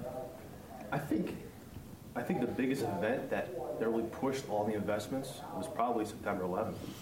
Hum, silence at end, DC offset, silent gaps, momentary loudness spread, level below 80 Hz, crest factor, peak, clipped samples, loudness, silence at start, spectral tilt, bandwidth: none; 0 s; under 0.1%; none; 13 LU; -62 dBFS; 18 dB; -18 dBFS; under 0.1%; -36 LUFS; 0 s; -6 dB/octave; 16 kHz